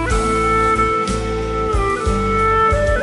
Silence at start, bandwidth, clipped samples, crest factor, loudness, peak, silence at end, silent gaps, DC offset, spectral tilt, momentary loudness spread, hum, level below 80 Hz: 0 s; 11.5 kHz; under 0.1%; 12 dB; -17 LUFS; -4 dBFS; 0 s; none; under 0.1%; -5.5 dB/octave; 6 LU; none; -24 dBFS